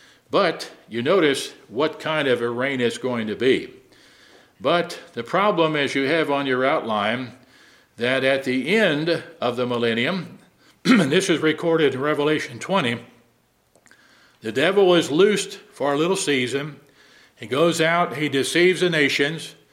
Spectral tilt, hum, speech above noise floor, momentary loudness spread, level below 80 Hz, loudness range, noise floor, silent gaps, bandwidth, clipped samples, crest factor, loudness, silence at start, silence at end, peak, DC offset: -4.5 dB/octave; none; 42 dB; 11 LU; -70 dBFS; 3 LU; -62 dBFS; none; 15.5 kHz; under 0.1%; 20 dB; -21 LUFS; 0.3 s; 0.2 s; -2 dBFS; under 0.1%